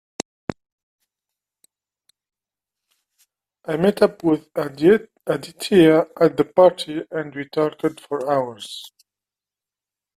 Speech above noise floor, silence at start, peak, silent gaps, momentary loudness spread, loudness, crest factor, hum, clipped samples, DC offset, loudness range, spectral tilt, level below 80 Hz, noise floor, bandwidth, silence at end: 71 dB; 0.5 s; -2 dBFS; 0.72-0.99 s; 18 LU; -20 LUFS; 20 dB; 50 Hz at -50 dBFS; under 0.1%; under 0.1%; 9 LU; -6 dB/octave; -60 dBFS; -90 dBFS; 14.5 kHz; 1.3 s